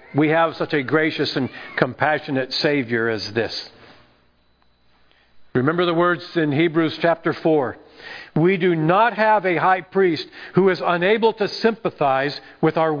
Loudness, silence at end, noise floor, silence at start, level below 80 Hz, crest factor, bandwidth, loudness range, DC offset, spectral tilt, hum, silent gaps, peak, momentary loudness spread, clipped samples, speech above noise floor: -20 LUFS; 0 s; -59 dBFS; 0.1 s; -62 dBFS; 20 dB; 5.2 kHz; 6 LU; under 0.1%; -7 dB/octave; none; none; 0 dBFS; 9 LU; under 0.1%; 40 dB